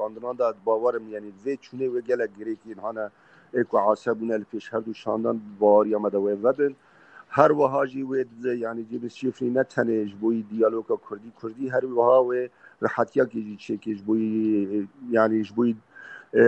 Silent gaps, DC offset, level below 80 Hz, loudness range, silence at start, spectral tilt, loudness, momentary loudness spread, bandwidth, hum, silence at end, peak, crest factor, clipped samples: none; under 0.1%; -74 dBFS; 5 LU; 0 s; -8 dB/octave; -25 LUFS; 14 LU; 8.2 kHz; none; 0 s; -2 dBFS; 22 dB; under 0.1%